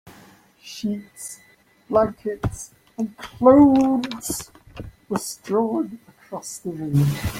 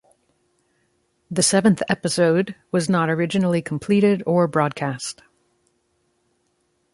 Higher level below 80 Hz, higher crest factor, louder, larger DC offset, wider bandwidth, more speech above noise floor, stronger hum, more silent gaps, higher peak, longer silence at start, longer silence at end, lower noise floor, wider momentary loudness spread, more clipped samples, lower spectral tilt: first, -48 dBFS vs -60 dBFS; about the same, 20 dB vs 18 dB; about the same, -21 LUFS vs -20 LUFS; neither; first, 16.5 kHz vs 11.5 kHz; second, 30 dB vs 49 dB; neither; neither; about the same, -2 dBFS vs -4 dBFS; second, 0.05 s vs 1.3 s; second, 0 s vs 1.8 s; second, -51 dBFS vs -68 dBFS; first, 22 LU vs 9 LU; neither; first, -6.5 dB/octave vs -5 dB/octave